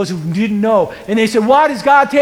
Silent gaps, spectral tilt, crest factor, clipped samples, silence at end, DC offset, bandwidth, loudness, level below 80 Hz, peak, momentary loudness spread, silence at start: none; -6 dB/octave; 12 dB; under 0.1%; 0 s; under 0.1%; 15.5 kHz; -13 LUFS; -50 dBFS; 0 dBFS; 7 LU; 0 s